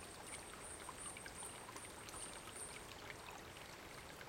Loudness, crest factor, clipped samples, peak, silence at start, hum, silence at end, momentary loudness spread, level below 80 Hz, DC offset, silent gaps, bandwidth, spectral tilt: -51 LUFS; 18 dB; under 0.1%; -34 dBFS; 0 s; none; 0 s; 4 LU; -68 dBFS; under 0.1%; none; 16.5 kHz; -2 dB/octave